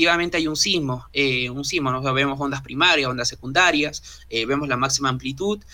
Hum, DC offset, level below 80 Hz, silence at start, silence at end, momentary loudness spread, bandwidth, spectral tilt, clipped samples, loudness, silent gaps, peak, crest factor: none; under 0.1%; -48 dBFS; 0 s; 0.1 s; 9 LU; 19 kHz; -3 dB/octave; under 0.1%; -21 LUFS; none; -4 dBFS; 18 dB